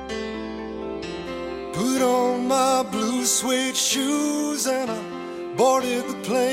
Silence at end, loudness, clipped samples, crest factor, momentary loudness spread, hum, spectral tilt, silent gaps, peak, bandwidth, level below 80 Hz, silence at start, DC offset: 0 s; -23 LUFS; under 0.1%; 16 dB; 11 LU; none; -2.5 dB/octave; none; -8 dBFS; 16.5 kHz; -54 dBFS; 0 s; under 0.1%